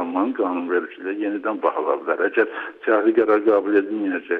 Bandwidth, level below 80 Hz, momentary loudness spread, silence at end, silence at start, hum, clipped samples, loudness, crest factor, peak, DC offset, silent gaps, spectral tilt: 4.3 kHz; -74 dBFS; 8 LU; 0 s; 0 s; none; under 0.1%; -21 LUFS; 14 dB; -6 dBFS; under 0.1%; none; -7.5 dB/octave